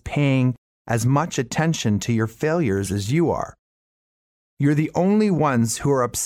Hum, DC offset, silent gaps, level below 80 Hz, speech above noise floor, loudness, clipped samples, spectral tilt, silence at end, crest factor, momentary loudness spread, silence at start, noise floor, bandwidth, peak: none; under 0.1%; 0.58-0.85 s, 3.59-4.57 s; -50 dBFS; over 70 dB; -21 LUFS; under 0.1%; -6 dB/octave; 0 s; 14 dB; 5 LU; 0.05 s; under -90 dBFS; 16 kHz; -8 dBFS